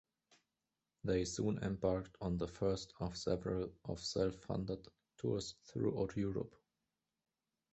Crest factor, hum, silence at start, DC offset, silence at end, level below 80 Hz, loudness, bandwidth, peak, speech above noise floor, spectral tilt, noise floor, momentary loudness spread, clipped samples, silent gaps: 18 dB; none; 1.05 s; under 0.1%; 1.25 s; -58 dBFS; -40 LUFS; 8.2 kHz; -22 dBFS; over 50 dB; -6 dB/octave; under -90 dBFS; 7 LU; under 0.1%; none